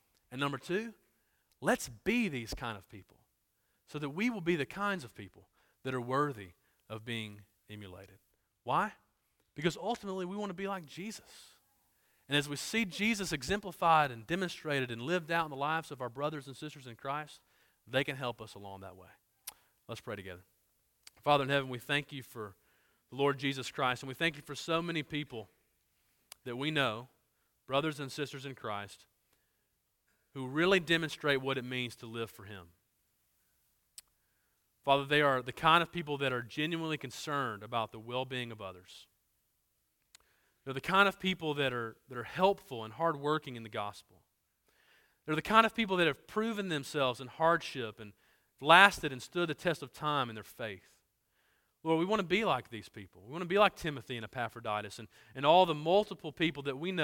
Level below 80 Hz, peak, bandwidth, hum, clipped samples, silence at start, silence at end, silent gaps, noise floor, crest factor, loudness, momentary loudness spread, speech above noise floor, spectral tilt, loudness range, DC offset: -66 dBFS; -6 dBFS; 17.5 kHz; none; under 0.1%; 0.3 s; 0 s; none; -79 dBFS; 30 dB; -33 LUFS; 20 LU; 46 dB; -4.5 dB/octave; 11 LU; under 0.1%